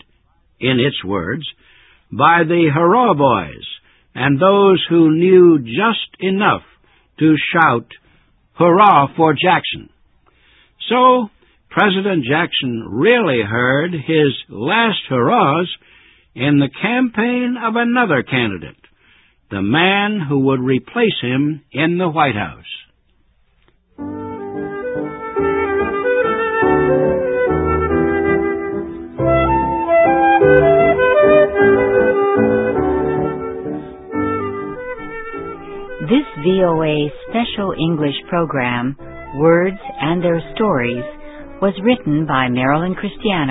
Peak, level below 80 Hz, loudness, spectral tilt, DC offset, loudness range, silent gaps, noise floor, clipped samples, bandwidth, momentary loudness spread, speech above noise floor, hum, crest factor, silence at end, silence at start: 0 dBFS; -40 dBFS; -15 LUFS; -10 dB/octave; under 0.1%; 7 LU; none; -57 dBFS; under 0.1%; 4 kHz; 15 LU; 42 dB; none; 16 dB; 0 s; 0.6 s